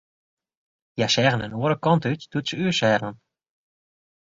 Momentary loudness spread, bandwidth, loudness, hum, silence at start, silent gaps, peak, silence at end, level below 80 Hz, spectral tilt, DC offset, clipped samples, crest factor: 8 LU; 7.8 kHz; -22 LUFS; none; 0.95 s; none; -4 dBFS; 1.15 s; -60 dBFS; -5 dB/octave; under 0.1%; under 0.1%; 22 dB